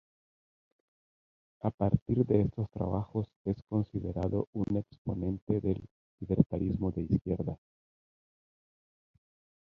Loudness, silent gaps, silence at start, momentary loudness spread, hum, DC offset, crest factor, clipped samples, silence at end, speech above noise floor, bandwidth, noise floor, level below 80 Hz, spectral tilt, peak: -33 LUFS; 1.74-1.78 s, 2.02-2.06 s, 3.36-3.45 s, 4.47-4.53 s, 4.98-5.05 s, 5.42-5.47 s, 5.91-6.18 s, 6.46-6.50 s; 1.65 s; 9 LU; none; under 0.1%; 24 dB; under 0.1%; 2.1 s; over 59 dB; 5.4 kHz; under -90 dBFS; -50 dBFS; -12 dB/octave; -8 dBFS